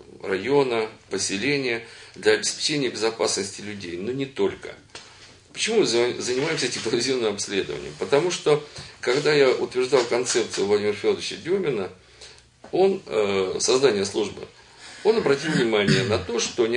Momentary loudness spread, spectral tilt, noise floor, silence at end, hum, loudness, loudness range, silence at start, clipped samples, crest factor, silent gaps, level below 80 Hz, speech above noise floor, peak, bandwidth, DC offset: 11 LU; -3.5 dB/octave; -49 dBFS; 0 s; none; -23 LUFS; 3 LU; 0 s; under 0.1%; 20 dB; none; -60 dBFS; 25 dB; -4 dBFS; 10.5 kHz; under 0.1%